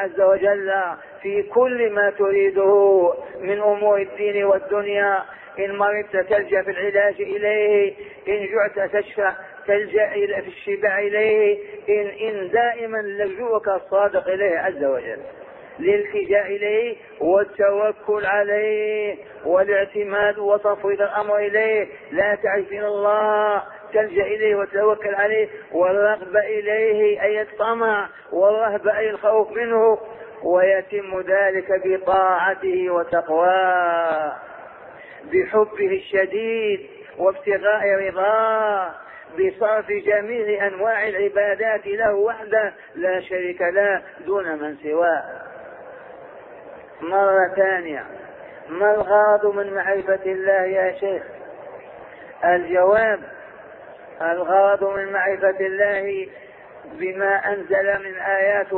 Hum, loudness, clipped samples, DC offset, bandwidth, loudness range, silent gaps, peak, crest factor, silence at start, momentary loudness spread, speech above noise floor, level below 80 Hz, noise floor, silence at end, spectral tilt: none; -20 LUFS; under 0.1%; under 0.1%; 4.1 kHz; 3 LU; none; -6 dBFS; 14 dB; 0 s; 12 LU; 21 dB; -60 dBFS; -41 dBFS; 0 s; -8.5 dB/octave